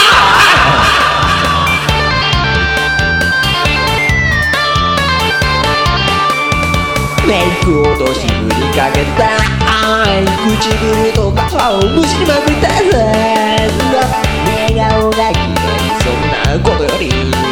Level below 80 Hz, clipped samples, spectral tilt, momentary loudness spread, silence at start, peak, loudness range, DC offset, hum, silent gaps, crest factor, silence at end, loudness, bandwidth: -22 dBFS; under 0.1%; -4.5 dB/octave; 4 LU; 0 s; 0 dBFS; 2 LU; under 0.1%; none; none; 10 dB; 0 s; -11 LUFS; 19 kHz